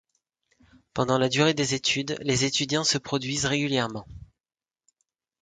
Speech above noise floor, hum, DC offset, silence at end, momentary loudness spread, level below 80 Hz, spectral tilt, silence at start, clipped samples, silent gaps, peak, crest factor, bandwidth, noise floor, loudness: over 65 dB; none; under 0.1%; 1.2 s; 7 LU; -56 dBFS; -3.5 dB/octave; 0.95 s; under 0.1%; none; -8 dBFS; 20 dB; 9.6 kHz; under -90 dBFS; -25 LUFS